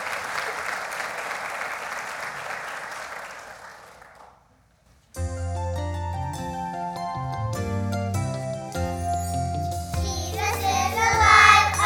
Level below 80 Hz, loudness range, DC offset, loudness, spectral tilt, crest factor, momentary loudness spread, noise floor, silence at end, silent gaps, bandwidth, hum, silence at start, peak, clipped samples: -40 dBFS; 12 LU; under 0.1%; -24 LUFS; -3.5 dB/octave; 24 dB; 15 LU; -59 dBFS; 0 s; none; 18.5 kHz; none; 0 s; 0 dBFS; under 0.1%